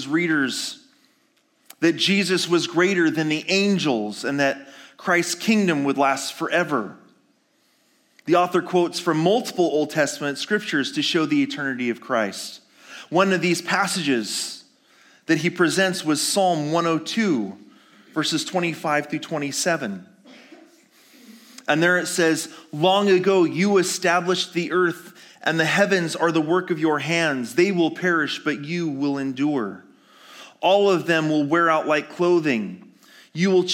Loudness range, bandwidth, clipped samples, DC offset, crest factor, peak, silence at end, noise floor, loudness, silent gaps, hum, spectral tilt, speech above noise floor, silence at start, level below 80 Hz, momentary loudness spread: 4 LU; 17 kHz; under 0.1%; under 0.1%; 18 dB; -4 dBFS; 0 s; -64 dBFS; -21 LUFS; none; none; -4 dB/octave; 43 dB; 0 s; -80 dBFS; 8 LU